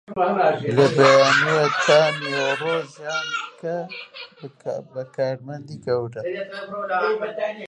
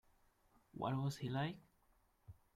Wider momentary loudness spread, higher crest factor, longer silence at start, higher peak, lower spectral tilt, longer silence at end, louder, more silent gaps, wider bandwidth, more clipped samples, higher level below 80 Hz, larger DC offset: about the same, 18 LU vs 16 LU; about the same, 20 dB vs 18 dB; second, 0.1 s vs 0.75 s; first, -2 dBFS vs -28 dBFS; second, -4.5 dB/octave vs -6.5 dB/octave; second, 0.05 s vs 0.25 s; first, -21 LUFS vs -43 LUFS; neither; second, 10 kHz vs 14 kHz; neither; about the same, -68 dBFS vs -72 dBFS; neither